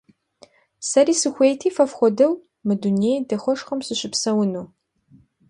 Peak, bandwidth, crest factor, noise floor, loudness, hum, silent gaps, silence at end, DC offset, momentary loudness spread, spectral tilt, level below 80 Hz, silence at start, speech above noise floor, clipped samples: -4 dBFS; 11.5 kHz; 18 dB; -55 dBFS; -20 LUFS; none; none; 0.85 s; under 0.1%; 8 LU; -4.5 dB/octave; -68 dBFS; 0.8 s; 35 dB; under 0.1%